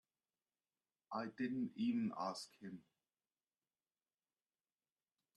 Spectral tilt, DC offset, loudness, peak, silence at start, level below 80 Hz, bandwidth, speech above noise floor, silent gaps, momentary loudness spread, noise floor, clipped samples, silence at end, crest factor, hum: -5.5 dB/octave; under 0.1%; -44 LUFS; -30 dBFS; 1.1 s; -88 dBFS; 11 kHz; over 47 dB; none; 15 LU; under -90 dBFS; under 0.1%; 2.55 s; 18 dB; none